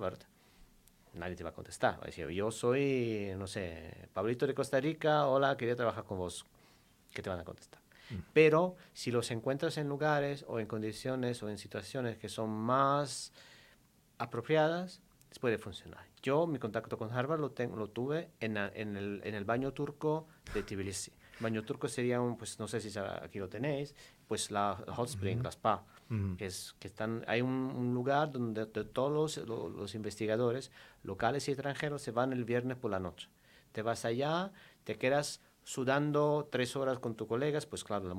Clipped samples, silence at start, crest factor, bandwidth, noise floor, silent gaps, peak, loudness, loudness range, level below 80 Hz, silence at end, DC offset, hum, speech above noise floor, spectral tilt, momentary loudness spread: under 0.1%; 0 s; 24 dB; 16.5 kHz; -67 dBFS; none; -12 dBFS; -36 LUFS; 4 LU; -66 dBFS; 0 s; under 0.1%; none; 31 dB; -5.5 dB/octave; 13 LU